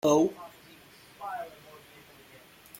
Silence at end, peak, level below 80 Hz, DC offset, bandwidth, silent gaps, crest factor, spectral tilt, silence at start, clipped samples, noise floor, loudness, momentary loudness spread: 0 s; -10 dBFS; -70 dBFS; under 0.1%; 16.5 kHz; none; 22 dB; -5 dB/octave; 0.05 s; under 0.1%; -54 dBFS; -31 LUFS; 26 LU